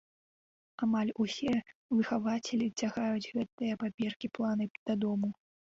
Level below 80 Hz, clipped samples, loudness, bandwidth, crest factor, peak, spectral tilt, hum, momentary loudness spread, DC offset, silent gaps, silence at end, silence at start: -70 dBFS; under 0.1%; -34 LUFS; 7.8 kHz; 14 dB; -20 dBFS; -5.5 dB/octave; none; 5 LU; under 0.1%; 1.75-1.89 s, 3.52-3.58 s, 3.94-3.98 s, 4.16-4.20 s, 4.71-4.86 s; 0.45 s; 0.8 s